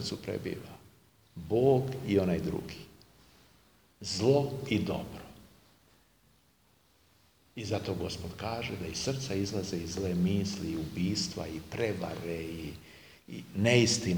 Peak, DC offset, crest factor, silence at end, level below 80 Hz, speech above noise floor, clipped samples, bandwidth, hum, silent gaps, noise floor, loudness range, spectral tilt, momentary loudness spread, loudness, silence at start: -10 dBFS; under 0.1%; 24 dB; 0 s; -56 dBFS; 36 dB; under 0.1%; over 20 kHz; none; none; -67 dBFS; 8 LU; -5 dB/octave; 20 LU; -32 LUFS; 0 s